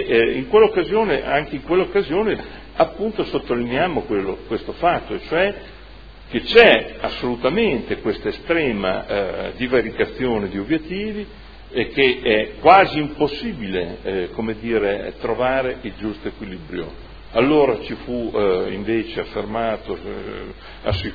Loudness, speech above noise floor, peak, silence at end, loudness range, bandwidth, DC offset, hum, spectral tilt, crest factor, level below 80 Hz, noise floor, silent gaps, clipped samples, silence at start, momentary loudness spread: -20 LUFS; 21 dB; 0 dBFS; 0 s; 5 LU; 5.4 kHz; 0.4%; none; -7.5 dB/octave; 20 dB; -40 dBFS; -40 dBFS; none; under 0.1%; 0 s; 14 LU